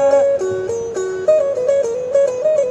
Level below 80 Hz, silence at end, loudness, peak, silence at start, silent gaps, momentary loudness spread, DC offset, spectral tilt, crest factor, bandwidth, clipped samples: -56 dBFS; 0 s; -17 LUFS; -4 dBFS; 0 s; none; 7 LU; under 0.1%; -5 dB/octave; 12 dB; 8.6 kHz; under 0.1%